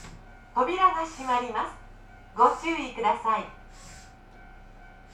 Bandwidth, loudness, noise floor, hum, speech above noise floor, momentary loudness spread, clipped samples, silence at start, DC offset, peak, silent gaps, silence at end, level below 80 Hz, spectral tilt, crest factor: 12 kHz; -26 LUFS; -49 dBFS; none; 23 dB; 24 LU; under 0.1%; 0 s; under 0.1%; -8 dBFS; none; 0.15 s; -50 dBFS; -4 dB/octave; 22 dB